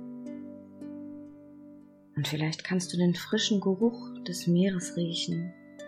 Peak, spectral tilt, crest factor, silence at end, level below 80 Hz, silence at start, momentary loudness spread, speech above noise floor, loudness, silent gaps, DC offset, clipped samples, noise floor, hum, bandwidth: -14 dBFS; -5 dB/octave; 16 dB; 0 s; -72 dBFS; 0 s; 19 LU; 24 dB; -29 LUFS; none; under 0.1%; under 0.1%; -52 dBFS; none; 15 kHz